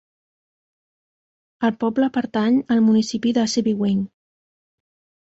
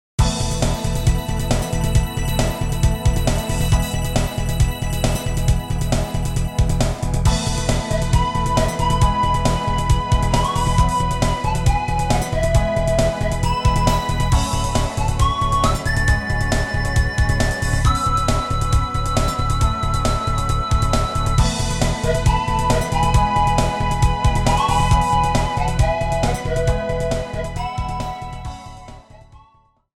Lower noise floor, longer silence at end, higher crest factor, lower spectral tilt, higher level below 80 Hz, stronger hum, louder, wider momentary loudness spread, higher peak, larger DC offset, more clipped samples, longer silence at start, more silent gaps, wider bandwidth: first, under -90 dBFS vs -56 dBFS; first, 1.25 s vs 0.6 s; about the same, 16 dB vs 16 dB; about the same, -5.5 dB/octave vs -5 dB/octave; second, -62 dBFS vs -22 dBFS; neither; about the same, -20 LUFS vs -20 LUFS; first, 7 LU vs 4 LU; second, -6 dBFS vs -2 dBFS; neither; neither; first, 1.6 s vs 0.2 s; neither; second, 8 kHz vs 16.5 kHz